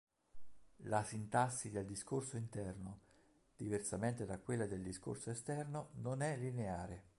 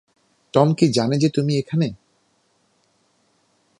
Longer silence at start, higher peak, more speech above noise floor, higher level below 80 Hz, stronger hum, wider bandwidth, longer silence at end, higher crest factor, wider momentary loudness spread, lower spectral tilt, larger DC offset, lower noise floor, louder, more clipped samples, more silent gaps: second, 0.35 s vs 0.55 s; second, -22 dBFS vs -2 dBFS; second, 29 dB vs 46 dB; about the same, -66 dBFS vs -62 dBFS; neither; about the same, 11.5 kHz vs 11 kHz; second, 0.1 s vs 1.85 s; about the same, 22 dB vs 20 dB; about the same, 8 LU vs 7 LU; about the same, -5.5 dB/octave vs -6.5 dB/octave; neither; first, -72 dBFS vs -64 dBFS; second, -43 LUFS vs -20 LUFS; neither; neither